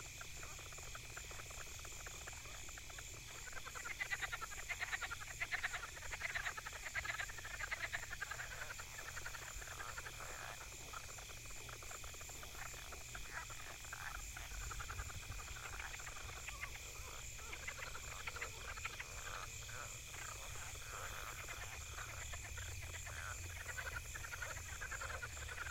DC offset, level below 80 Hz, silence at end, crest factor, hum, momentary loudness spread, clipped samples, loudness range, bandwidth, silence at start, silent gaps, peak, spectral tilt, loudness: under 0.1%; -56 dBFS; 0 s; 22 dB; none; 7 LU; under 0.1%; 6 LU; 16.5 kHz; 0 s; none; -26 dBFS; -1.5 dB/octave; -47 LUFS